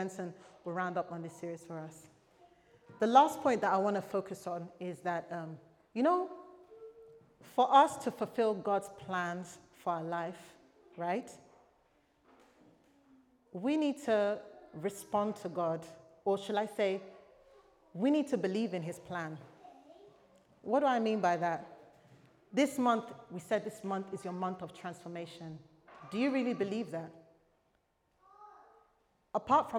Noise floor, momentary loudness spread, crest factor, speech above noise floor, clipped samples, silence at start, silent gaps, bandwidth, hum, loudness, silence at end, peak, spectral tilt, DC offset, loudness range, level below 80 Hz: -76 dBFS; 19 LU; 26 dB; 42 dB; under 0.1%; 0 s; none; 17 kHz; none; -34 LUFS; 0 s; -10 dBFS; -5.5 dB/octave; under 0.1%; 8 LU; -78 dBFS